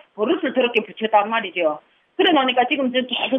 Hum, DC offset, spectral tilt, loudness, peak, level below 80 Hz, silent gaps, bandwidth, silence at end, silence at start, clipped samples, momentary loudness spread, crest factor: none; under 0.1%; -6 dB/octave; -19 LUFS; -4 dBFS; -76 dBFS; none; 5.8 kHz; 0 s; 0.15 s; under 0.1%; 6 LU; 16 dB